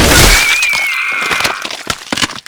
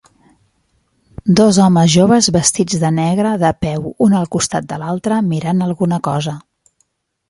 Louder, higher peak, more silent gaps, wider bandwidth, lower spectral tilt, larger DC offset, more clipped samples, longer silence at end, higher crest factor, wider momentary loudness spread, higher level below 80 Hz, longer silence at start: first, -11 LUFS vs -14 LUFS; about the same, 0 dBFS vs 0 dBFS; neither; first, over 20 kHz vs 11.5 kHz; second, -2 dB/octave vs -5 dB/octave; neither; first, 0.5% vs under 0.1%; second, 0.1 s vs 0.9 s; about the same, 12 dB vs 14 dB; about the same, 13 LU vs 11 LU; first, -20 dBFS vs -46 dBFS; second, 0 s vs 1.25 s